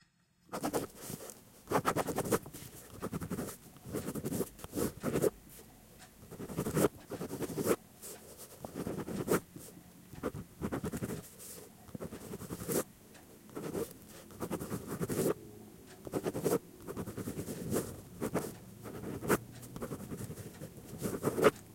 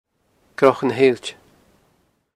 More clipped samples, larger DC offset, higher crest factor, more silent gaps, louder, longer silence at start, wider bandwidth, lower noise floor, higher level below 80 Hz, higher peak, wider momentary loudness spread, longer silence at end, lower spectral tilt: neither; neither; about the same, 26 dB vs 22 dB; neither; second, -38 LUFS vs -18 LUFS; about the same, 0.5 s vs 0.6 s; first, 16.5 kHz vs 11.5 kHz; first, -68 dBFS vs -64 dBFS; about the same, -62 dBFS vs -66 dBFS; second, -12 dBFS vs 0 dBFS; about the same, 17 LU vs 17 LU; second, 0 s vs 1.05 s; about the same, -5 dB/octave vs -5.5 dB/octave